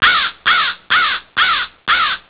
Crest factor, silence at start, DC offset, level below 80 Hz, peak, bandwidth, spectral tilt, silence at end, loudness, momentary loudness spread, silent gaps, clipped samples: 16 dB; 0 s; 0.2%; -48 dBFS; 0 dBFS; 4 kHz; -4 dB/octave; 0.1 s; -14 LUFS; 3 LU; none; under 0.1%